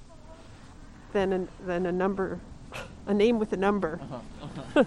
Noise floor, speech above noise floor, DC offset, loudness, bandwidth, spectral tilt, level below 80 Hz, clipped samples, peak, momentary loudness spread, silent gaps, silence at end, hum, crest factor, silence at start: -47 dBFS; 20 dB; under 0.1%; -28 LUFS; 11.5 kHz; -7 dB/octave; -50 dBFS; under 0.1%; -8 dBFS; 25 LU; none; 0 s; none; 20 dB; 0 s